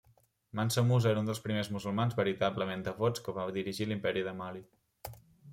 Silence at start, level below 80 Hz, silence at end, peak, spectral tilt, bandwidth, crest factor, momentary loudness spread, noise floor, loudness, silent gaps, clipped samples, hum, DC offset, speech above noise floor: 0.55 s; -66 dBFS; 0 s; -16 dBFS; -6 dB/octave; 16.5 kHz; 16 dB; 17 LU; -68 dBFS; -33 LUFS; none; under 0.1%; none; under 0.1%; 36 dB